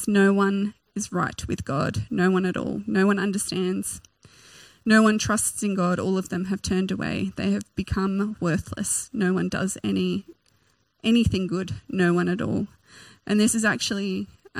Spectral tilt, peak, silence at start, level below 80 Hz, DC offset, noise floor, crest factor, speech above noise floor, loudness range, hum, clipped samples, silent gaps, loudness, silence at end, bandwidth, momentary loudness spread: -5 dB/octave; -6 dBFS; 0 s; -48 dBFS; under 0.1%; -66 dBFS; 18 dB; 42 dB; 3 LU; none; under 0.1%; none; -24 LUFS; 0 s; 15.5 kHz; 10 LU